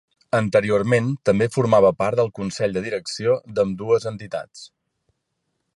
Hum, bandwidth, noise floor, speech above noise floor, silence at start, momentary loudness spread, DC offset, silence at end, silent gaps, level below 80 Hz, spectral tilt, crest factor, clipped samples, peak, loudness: none; 11.5 kHz; -75 dBFS; 55 dB; 0.35 s; 12 LU; under 0.1%; 1.1 s; none; -54 dBFS; -6 dB/octave; 18 dB; under 0.1%; -4 dBFS; -21 LUFS